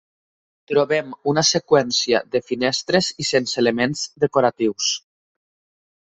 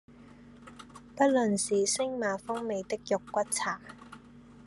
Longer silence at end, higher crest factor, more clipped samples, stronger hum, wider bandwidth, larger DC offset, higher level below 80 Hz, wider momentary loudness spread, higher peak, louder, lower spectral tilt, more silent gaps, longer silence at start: first, 1.1 s vs 0.05 s; about the same, 18 dB vs 20 dB; neither; neither; second, 8.4 kHz vs 12.5 kHz; neither; first, -60 dBFS vs -66 dBFS; second, 5 LU vs 23 LU; first, -4 dBFS vs -12 dBFS; first, -20 LUFS vs -30 LUFS; about the same, -3.5 dB/octave vs -3.5 dB/octave; neither; first, 0.7 s vs 0.1 s